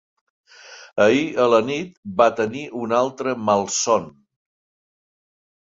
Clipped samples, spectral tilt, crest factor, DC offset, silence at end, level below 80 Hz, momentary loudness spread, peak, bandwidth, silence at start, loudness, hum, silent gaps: under 0.1%; -4 dB/octave; 20 dB; under 0.1%; 1.5 s; -62 dBFS; 11 LU; -2 dBFS; 7.8 kHz; 0.65 s; -20 LUFS; none; 1.97-2.03 s